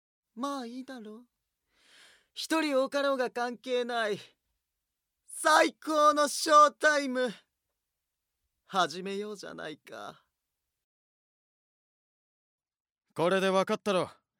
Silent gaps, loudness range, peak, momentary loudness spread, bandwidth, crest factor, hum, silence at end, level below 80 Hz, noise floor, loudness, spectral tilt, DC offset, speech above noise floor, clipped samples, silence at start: 10.84-12.58 s, 12.80-12.85 s, 12.92-12.96 s; 12 LU; -8 dBFS; 21 LU; 18 kHz; 24 dB; none; 0.3 s; -86 dBFS; -86 dBFS; -28 LUFS; -3 dB/octave; under 0.1%; 58 dB; under 0.1%; 0.35 s